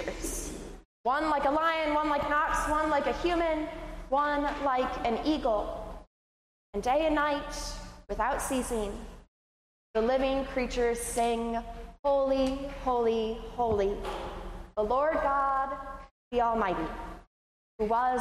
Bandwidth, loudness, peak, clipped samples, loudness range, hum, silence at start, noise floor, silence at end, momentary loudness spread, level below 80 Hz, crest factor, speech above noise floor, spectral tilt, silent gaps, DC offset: 15 kHz; -30 LUFS; -16 dBFS; under 0.1%; 3 LU; none; 0 s; under -90 dBFS; 0 s; 13 LU; -44 dBFS; 14 dB; over 61 dB; -4 dB/octave; 0.85-1.04 s, 6.07-6.73 s, 9.28-9.94 s, 11.99-12.03 s, 16.11-16.31 s, 17.27-17.79 s; under 0.1%